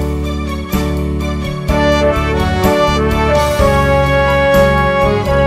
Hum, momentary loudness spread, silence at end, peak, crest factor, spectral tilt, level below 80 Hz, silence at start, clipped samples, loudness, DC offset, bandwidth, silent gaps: none; 8 LU; 0 s; 0 dBFS; 12 dB; -6 dB/octave; -20 dBFS; 0 s; under 0.1%; -13 LUFS; under 0.1%; 16 kHz; none